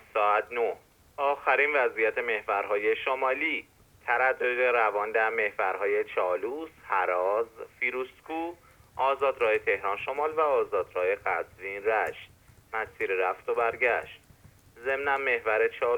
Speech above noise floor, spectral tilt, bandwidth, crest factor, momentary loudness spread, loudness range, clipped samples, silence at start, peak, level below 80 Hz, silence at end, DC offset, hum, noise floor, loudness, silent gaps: 28 dB; -4.5 dB/octave; 19 kHz; 18 dB; 11 LU; 3 LU; under 0.1%; 0.15 s; -10 dBFS; -66 dBFS; 0 s; under 0.1%; none; -56 dBFS; -28 LUFS; none